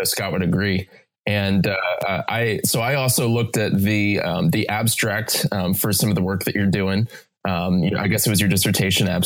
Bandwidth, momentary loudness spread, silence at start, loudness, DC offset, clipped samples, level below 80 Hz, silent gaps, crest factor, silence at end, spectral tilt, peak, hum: 19 kHz; 5 LU; 0 s; -20 LUFS; under 0.1%; under 0.1%; -50 dBFS; none; 14 dB; 0 s; -4.5 dB/octave; -6 dBFS; none